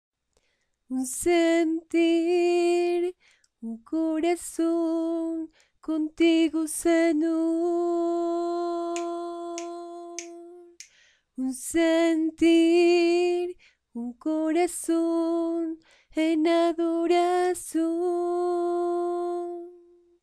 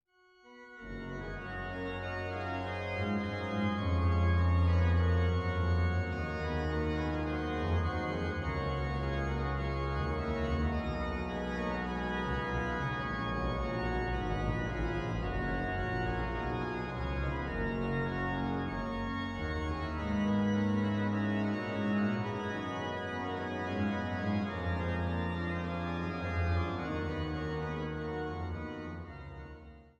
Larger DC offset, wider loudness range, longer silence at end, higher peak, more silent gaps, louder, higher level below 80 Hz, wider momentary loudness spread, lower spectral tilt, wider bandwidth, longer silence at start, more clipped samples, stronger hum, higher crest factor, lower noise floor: neither; about the same, 6 LU vs 5 LU; first, 0.45 s vs 0.1 s; first, -12 dBFS vs -20 dBFS; neither; first, -25 LUFS vs -34 LUFS; second, -64 dBFS vs -42 dBFS; first, 15 LU vs 7 LU; second, -3 dB/octave vs -7.5 dB/octave; first, 13.5 kHz vs 7 kHz; first, 0.9 s vs 0.45 s; neither; neither; about the same, 14 dB vs 14 dB; first, -73 dBFS vs -63 dBFS